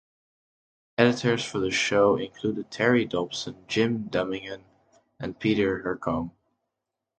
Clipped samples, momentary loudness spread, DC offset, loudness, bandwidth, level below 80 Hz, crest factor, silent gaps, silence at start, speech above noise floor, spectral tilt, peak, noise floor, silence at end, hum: under 0.1%; 13 LU; under 0.1%; -26 LUFS; 9.2 kHz; -56 dBFS; 24 dB; none; 1 s; 59 dB; -5 dB/octave; -2 dBFS; -85 dBFS; 0.9 s; none